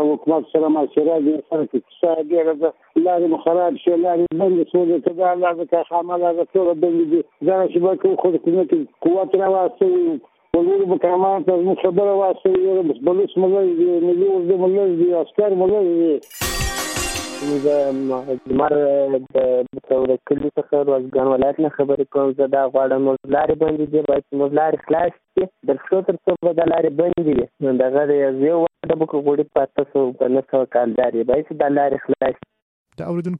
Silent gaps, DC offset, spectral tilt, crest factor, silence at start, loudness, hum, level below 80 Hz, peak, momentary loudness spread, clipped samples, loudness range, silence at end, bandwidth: 32.62-32.85 s; under 0.1%; -6 dB/octave; 14 dB; 0 s; -18 LUFS; none; -46 dBFS; -4 dBFS; 5 LU; under 0.1%; 2 LU; 0 s; 13 kHz